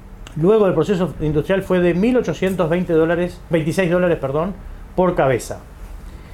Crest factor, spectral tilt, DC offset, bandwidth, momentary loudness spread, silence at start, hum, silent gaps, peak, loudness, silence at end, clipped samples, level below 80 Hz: 16 dB; -7 dB/octave; under 0.1%; 15.5 kHz; 17 LU; 0 s; none; none; -4 dBFS; -18 LUFS; 0 s; under 0.1%; -36 dBFS